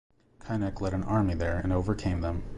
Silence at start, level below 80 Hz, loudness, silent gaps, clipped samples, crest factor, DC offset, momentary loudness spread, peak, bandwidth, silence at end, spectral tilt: 0.45 s; -38 dBFS; -30 LUFS; none; under 0.1%; 14 dB; under 0.1%; 5 LU; -14 dBFS; 11 kHz; 0 s; -8 dB/octave